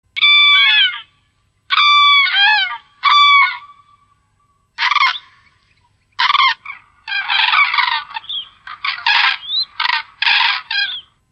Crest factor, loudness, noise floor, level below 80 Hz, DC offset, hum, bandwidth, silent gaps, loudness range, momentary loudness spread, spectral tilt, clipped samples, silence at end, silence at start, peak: 14 dB; -12 LUFS; -61 dBFS; -66 dBFS; under 0.1%; none; 8.4 kHz; none; 7 LU; 17 LU; 2.5 dB/octave; under 0.1%; 0.3 s; 0.15 s; -2 dBFS